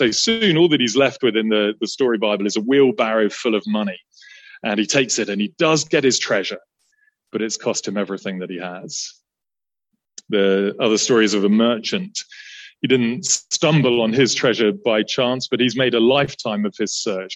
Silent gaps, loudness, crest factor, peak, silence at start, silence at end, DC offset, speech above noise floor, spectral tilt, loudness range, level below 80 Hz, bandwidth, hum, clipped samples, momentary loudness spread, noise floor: none; -18 LUFS; 16 dB; -2 dBFS; 0 s; 0 s; under 0.1%; over 71 dB; -3.5 dB/octave; 7 LU; -64 dBFS; 8.6 kHz; none; under 0.1%; 12 LU; under -90 dBFS